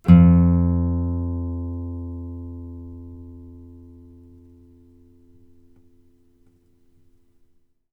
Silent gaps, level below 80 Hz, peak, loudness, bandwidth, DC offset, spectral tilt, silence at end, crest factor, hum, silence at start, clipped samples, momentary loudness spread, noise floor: none; -36 dBFS; 0 dBFS; -20 LUFS; 3.1 kHz; under 0.1%; -11.5 dB/octave; 4.2 s; 22 dB; none; 0.05 s; under 0.1%; 28 LU; -59 dBFS